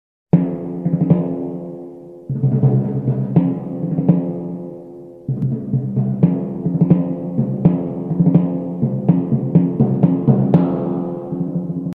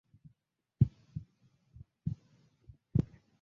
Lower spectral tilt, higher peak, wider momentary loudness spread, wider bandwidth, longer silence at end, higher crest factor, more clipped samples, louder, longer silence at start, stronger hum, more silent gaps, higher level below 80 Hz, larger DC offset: about the same, -13 dB/octave vs -12.5 dB/octave; first, 0 dBFS vs -12 dBFS; second, 12 LU vs 16 LU; second, 3 kHz vs 4.4 kHz; second, 0.05 s vs 0.35 s; second, 16 dB vs 26 dB; neither; first, -18 LUFS vs -37 LUFS; second, 0.35 s vs 0.8 s; neither; neither; about the same, -50 dBFS vs -52 dBFS; neither